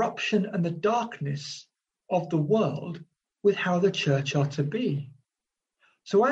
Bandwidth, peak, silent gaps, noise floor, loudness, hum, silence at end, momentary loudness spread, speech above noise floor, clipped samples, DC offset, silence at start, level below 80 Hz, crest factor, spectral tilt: 8 kHz; -10 dBFS; none; -88 dBFS; -27 LUFS; none; 0 s; 12 LU; 62 dB; under 0.1%; under 0.1%; 0 s; -70 dBFS; 16 dB; -6 dB/octave